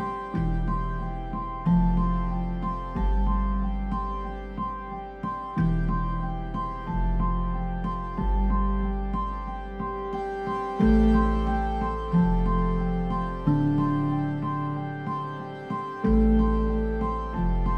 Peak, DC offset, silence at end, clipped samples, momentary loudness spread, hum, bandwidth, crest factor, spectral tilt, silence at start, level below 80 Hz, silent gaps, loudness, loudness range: -10 dBFS; under 0.1%; 0 s; under 0.1%; 10 LU; none; 5 kHz; 14 dB; -9.5 dB/octave; 0 s; -30 dBFS; none; -27 LUFS; 5 LU